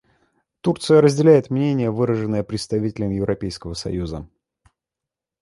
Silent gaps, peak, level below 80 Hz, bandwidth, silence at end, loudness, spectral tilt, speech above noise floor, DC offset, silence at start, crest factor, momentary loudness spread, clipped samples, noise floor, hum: none; -2 dBFS; -46 dBFS; 11.5 kHz; 1.15 s; -20 LUFS; -7 dB/octave; 68 dB; under 0.1%; 0.65 s; 18 dB; 13 LU; under 0.1%; -87 dBFS; none